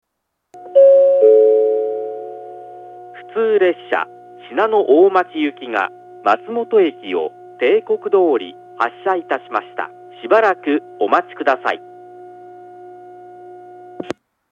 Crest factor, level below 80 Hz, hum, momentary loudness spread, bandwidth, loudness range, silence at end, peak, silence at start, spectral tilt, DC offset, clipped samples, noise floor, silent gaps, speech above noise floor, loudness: 16 dB; -76 dBFS; 60 Hz at -55 dBFS; 20 LU; 7 kHz; 6 LU; 0.4 s; 0 dBFS; 0.55 s; -6 dB/octave; under 0.1%; under 0.1%; -75 dBFS; none; 58 dB; -16 LUFS